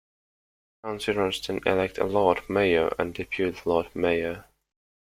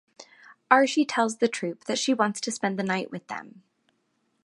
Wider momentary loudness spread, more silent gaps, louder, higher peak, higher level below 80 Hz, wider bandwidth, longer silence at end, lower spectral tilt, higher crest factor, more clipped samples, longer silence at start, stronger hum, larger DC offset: second, 9 LU vs 14 LU; neither; about the same, -26 LUFS vs -25 LUFS; second, -6 dBFS vs -2 dBFS; first, -54 dBFS vs -80 dBFS; first, 16 kHz vs 11.5 kHz; second, 0.75 s vs 0.95 s; first, -5.5 dB/octave vs -3.5 dB/octave; about the same, 22 dB vs 26 dB; neither; first, 0.85 s vs 0.2 s; neither; neither